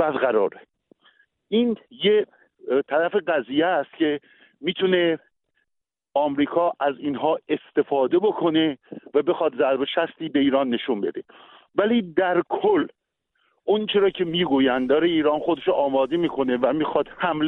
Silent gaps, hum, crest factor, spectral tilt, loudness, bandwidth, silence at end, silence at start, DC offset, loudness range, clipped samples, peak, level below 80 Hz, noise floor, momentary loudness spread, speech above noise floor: none; none; 16 dB; -8.5 dB/octave; -22 LUFS; 4.1 kHz; 0 s; 0 s; under 0.1%; 3 LU; under 0.1%; -8 dBFS; -62 dBFS; -81 dBFS; 6 LU; 59 dB